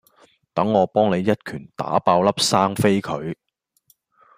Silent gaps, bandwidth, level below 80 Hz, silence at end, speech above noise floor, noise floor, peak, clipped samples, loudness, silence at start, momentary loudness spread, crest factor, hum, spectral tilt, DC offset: none; 15.5 kHz; -58 dBFS; 1.05 s; 43 dB; -62 dBFS; -2 dBFS; under 0.1%; -20 LUFS; 0.55 s; 13 LU; 20 dB; none; -5 dB/octave; under 0.1%